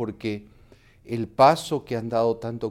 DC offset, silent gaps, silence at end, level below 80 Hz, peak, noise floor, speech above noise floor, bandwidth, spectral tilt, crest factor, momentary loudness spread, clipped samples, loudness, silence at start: under 0.1%; none; 0 s; -56 dBFS; -4 dBFS; -53 dBFS; 30 dB; 15.5 kHz; -6 dB/octave; 20 dB; 14 LU; under 0.1%; -24 LUFS; 0 s